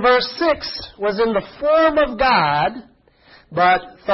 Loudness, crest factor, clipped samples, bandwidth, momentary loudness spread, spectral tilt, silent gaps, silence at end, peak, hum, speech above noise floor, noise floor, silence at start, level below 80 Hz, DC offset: -18 LUFS; 16 dB; under 0.1%; 6 kHz; 9 LU; -7.5 dB/octave; none; 0 s; -2 dBFS; none; 33 dB; -50 dBFS; 0 s; -44 dBFS; under 0.1%